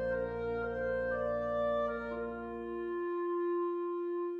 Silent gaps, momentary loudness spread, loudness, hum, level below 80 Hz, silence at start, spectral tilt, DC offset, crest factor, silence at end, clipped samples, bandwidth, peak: none; 6 LU; -36 LUFS; none; -56 dBFS; 0 s; -8.5 dB/octave; under 0.1%; 10 dB; 0 s; under 0.1%; 5 kHz; -24 dBFS